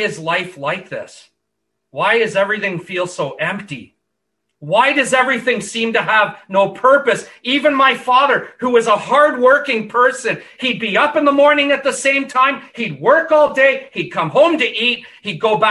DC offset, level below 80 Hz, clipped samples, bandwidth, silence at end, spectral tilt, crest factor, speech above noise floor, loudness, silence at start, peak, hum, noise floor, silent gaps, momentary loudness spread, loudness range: under 0.1%; -64 dBFS; under 0.1%; 12 kHz; 0 s; -3.5 dB/octave; 16 dB; 59 dB; -15 LUFS; 0 s; 0 dBFS; none; -75 dBFS; none; 10 LU; 6 LU